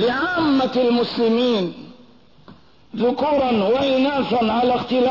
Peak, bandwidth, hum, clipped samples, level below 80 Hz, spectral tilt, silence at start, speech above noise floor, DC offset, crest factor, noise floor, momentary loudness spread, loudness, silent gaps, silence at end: -10 dBFS; 6 kHz; none; under 0.1%; -54 dBFS; -6.5 dB/octave; 0 s; 32 dB; 0.3%; 10 dB; -50 dBFS; 5 LU; -19 LUFS; none; 0 s